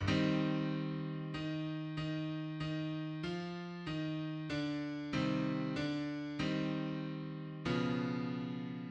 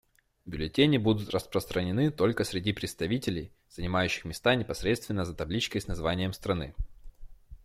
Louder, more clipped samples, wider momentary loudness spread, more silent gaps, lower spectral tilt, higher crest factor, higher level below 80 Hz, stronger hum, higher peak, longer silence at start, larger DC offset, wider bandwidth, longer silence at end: second, -39 LUFS vs -30 LUFS; neither; second, 7 LU vs 11 LU; neither; first, -7 dB/octave vs -5.5 dB/octave; about the same, 16 dB vs 20 dB; second, -64 dBFS vs -46 dBFS; neither; second, -22 dBFS vs -10 dBFS; second, 0 s vs 0.45 s; neither; second, 8.4 kHz vs 16 kHz; about the same, 0 s vs 0.1 s